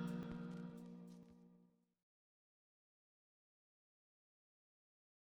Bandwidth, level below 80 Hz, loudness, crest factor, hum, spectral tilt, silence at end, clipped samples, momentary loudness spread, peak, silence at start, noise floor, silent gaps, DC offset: 13 kHz; -78 dBFS; -52 LUFS; 20 dB; none; -8 dB/octave; 3.6 s; under 0.1%; 19 LU; -34 dBFS; 0 s; -74 dBFS; none; under 0.1%